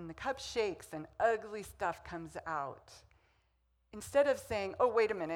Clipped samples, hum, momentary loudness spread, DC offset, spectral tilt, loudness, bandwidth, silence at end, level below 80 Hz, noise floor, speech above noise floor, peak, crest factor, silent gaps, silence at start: under 0.1%; none; 15 LU; under 0.1%; -4 dB/octave; -35 LUFS; 17 kHz; 0 s; -64 dBFS; -76 dBFS; 40 dB; -18 dBFS; 20 dB; none; 0 s